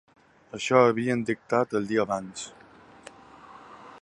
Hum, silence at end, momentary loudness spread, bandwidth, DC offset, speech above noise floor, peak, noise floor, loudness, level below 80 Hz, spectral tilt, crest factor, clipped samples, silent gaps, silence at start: none; 0.05 s; 24 LU; 11 kHz; under 0.1%; 25 dB; -6 dBFS; -50 dBFS; -25 LUFS; -66 dBFS; -5.5 dB/octave; 22 dB; under 0.1%; none; 0.55 s